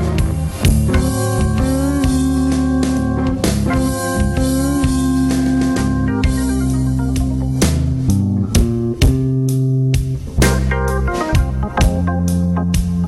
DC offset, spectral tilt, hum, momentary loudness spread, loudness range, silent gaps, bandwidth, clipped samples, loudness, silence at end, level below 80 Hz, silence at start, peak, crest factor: under 0.1%; -6 dB/octave; none; 2 LU; 1 LU; none; 15.5 kHz; under 0.1%; -16 LUFS; 0 s; -22 dBFS; 0 s; -2 dBFS; 12 dB